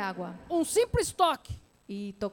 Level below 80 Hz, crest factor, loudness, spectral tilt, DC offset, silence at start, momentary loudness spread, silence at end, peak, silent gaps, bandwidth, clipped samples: -48 dBFS; 18 dB; -29 LUFS; -4 dB/octave; under 0.1%; 0 s; 16 LU; 0 s; -12 dBFS; none; 18.5 kHz; under 0.1%